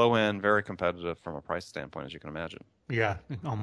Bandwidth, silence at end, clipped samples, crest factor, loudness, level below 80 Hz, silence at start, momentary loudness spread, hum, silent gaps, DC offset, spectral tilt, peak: 11 kHz; 0 s; under 0.1%; 20 dB; -31 LUFS; -58 dBFS; 0 s; 15 LU; none; none; under 0.1%; -6.5 dB/octave; -10 dBFS